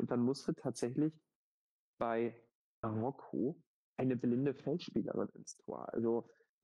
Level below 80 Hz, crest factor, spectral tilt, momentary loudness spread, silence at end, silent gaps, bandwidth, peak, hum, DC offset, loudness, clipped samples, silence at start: -74 dBFS; 16 dB; -7 dB/octave; 10 LU; 0.4 s; 1.35-1.98 s, 2.55-2.83 s, 3.66-3.96 s; 11.5 kHz; -24 dBFS; none; under 0.1%; -39 LUFS; under 0.1%; 0 s